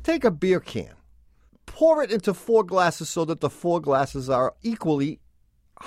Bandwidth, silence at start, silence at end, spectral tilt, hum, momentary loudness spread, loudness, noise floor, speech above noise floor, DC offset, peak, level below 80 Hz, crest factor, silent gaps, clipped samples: 15 kHz; 0 s; 0 s; -5.5 dB/octave; none; 9 LU; -23 LUFS; -60 dBFS; 37 dB; under 0.1%; -6 dBFS; -52 dBFS; 18 dB; none; under 0.1%